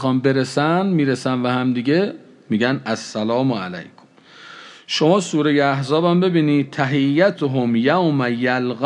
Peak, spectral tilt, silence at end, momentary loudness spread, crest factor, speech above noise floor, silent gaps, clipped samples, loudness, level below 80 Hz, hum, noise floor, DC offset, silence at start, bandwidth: -2 dBFS; -6 dB/octave; 0 s; 8 LU; 16 dB; 28 dB; none; under 0.1%; -18 LUFS; -72 dBFS; none; -46 dBFS; under 0.1%; 0 s; 11 kHz